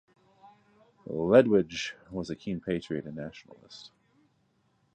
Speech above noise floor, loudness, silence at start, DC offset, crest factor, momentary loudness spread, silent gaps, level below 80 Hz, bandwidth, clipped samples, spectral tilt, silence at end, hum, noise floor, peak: 42 dB; -28 LUFS; 1.1 s; under 0.1%; 24 dB; 27 LU; none; -62 dBFS; 9 kHz; under 0.1%; -6 dB/octave; 1.1 s; none; -71 dBFS; -6 dBFS